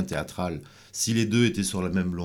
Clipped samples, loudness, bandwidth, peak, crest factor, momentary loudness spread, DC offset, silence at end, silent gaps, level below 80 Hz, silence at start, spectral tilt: under 0.1%; -26 LUFS; 18 kHz; -8 dBFS; 18 dB; 11 LU; under 0.1%; 0 s; none; -50 dBFS; 0 s; -4.5 dB/octave